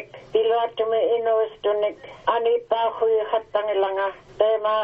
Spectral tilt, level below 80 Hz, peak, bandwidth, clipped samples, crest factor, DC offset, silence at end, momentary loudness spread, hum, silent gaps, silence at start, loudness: -5.5 dB/octave; -62 dBFS; -6 dBFS; 4.9 kHz; under 0.1%; 16 dB; under 0.1%; 0 s; 5 LU; none; none; 0 s; -23 LUFS